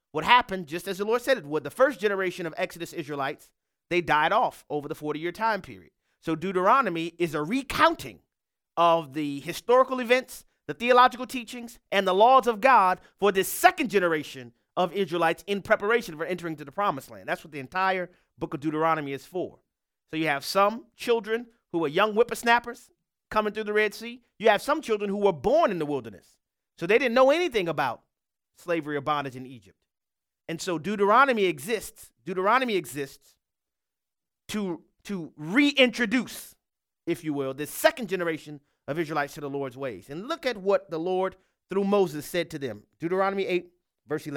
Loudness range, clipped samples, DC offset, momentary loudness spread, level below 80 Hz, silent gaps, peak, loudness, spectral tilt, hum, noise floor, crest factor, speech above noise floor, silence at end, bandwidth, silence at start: 7 LU; under 0.1%; under 0.1%; 16 LU; -62 dBFS; none; -2 dBFS; -26 LUFS; -4.5 dB/octave; none; under -90 dBFS; 24 dB; over 64 dB; 0 s; 18.5 kHz; 0.15 s